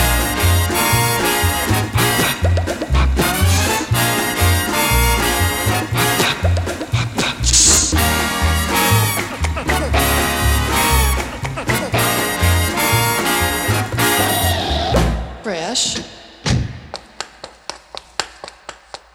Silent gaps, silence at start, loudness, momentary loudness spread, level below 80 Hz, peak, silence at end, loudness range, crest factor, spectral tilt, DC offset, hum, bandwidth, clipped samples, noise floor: none; 0 s; -16 LUFS; 12 LU; -24 dBFS; 0 dBFS; 0.2 s; 6 LU; 16 dB; -3.5 dB/octave; under 0.1%; none; 18.5 kHz; under 0.1%; -37 dBFS